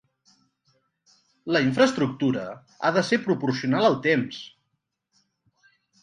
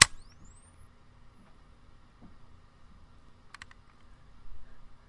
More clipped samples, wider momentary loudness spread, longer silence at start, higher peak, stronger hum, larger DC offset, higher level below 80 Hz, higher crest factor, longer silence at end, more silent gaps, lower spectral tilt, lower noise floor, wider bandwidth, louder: neither; first, 16 LU vs 10 LU; first, 1.45 s vs 0 s; second, -6 dBFS vs 0 dBFS; neither; neither; second, -68 dBFS vs -54 dBFS; second, 20 dB vs 36 dB; first, 1.55 s vs 0.15 s; neither; first, -5.5 dB/octave vs 0 dB/octave; first, -78 dBFS vs -55 dBFS; second, 10.5 kHz vs 12 kHz; about the same, -23 LUFS vs -22 LUFS